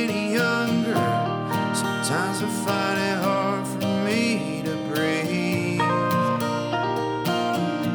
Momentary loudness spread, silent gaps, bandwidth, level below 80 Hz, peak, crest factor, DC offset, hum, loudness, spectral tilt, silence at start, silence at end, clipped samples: 3 LU; none; over 20 kHz; -64 dBFS; -10 dBFS; 14 dB; under 0.1%; none; -24 LUFS; -5 dB/octave; 0 s; 0 s; under 0.1%